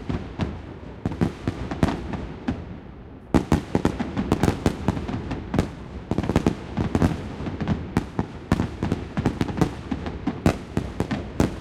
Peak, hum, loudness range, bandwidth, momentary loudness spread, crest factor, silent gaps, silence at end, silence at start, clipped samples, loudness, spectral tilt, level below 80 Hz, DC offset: -2 dBFS; none; 2 LU; 16.5 kHz; 9 LU; 24 dB; none; 0 s; 0 s; under 0.1%; -26 LUFS; -7 dB/octave; -36 dBFS; under 0.1%